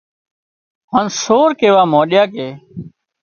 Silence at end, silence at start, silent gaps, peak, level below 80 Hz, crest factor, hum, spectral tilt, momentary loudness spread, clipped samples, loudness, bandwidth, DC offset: 0.35 s; 0.9 s; none; 0 dBFS; -58 dBFS; 16 dB; none; -4.5 dB/octave; 20 LU; under 0.1%; -13 LUFS; 7 kHz; under 0.1%